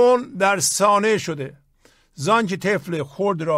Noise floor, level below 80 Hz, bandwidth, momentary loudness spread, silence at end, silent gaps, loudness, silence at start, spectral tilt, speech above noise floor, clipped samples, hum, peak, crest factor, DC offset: -57 dBFS; -62 dBFS; 16 kHz; 12 LU; 0 s; none; -20 LUFS; 0 s; -4 dB/octave; 38 dB; under 0.1%; none; -4 dBFS; 16 dB; under 0.1%